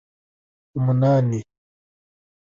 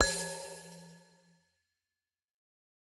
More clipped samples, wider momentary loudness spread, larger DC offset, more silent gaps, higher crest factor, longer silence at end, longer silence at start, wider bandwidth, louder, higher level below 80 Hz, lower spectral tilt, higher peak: neither; second, 13 LU vs 24 LU; neither; neither; second, 16 dB vs 30 dB; second, 1.1 s vs 1.85 s; first, 0.75 s vs 0 s; second, 7.2 kHz vs 13 kHz; first, -21 LUFS vs -37 LUFS; about the same, -58 dBFS vs -54 dBFS; first, -9.5 dB/octave vs -1.5 dB/octave; about the same, -8 dBFS vs -10 dBFS